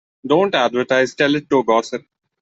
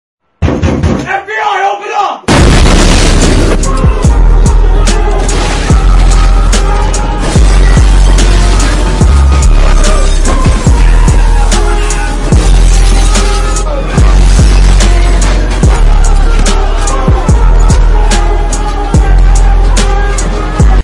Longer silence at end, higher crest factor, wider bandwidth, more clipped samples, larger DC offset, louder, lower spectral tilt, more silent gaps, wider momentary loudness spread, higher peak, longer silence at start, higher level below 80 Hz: first, 0.45 s vs 0 s; first, 16 dB vs 6 dB; second, 8 kHz vs 11.5 kHz; second, under 0.1% vs 0.8%; neither; second, -17 LUFS vs -9 LUFS; about the same, -5 dB/octave vs -5 dB/octave; neither; about the same, 4 LU vs 5 LU; about the same, -2 dBFS vs 0 dBFS; second, 0.25 s vs 0.4 s; second, -62 dBFS vs -6 dBFS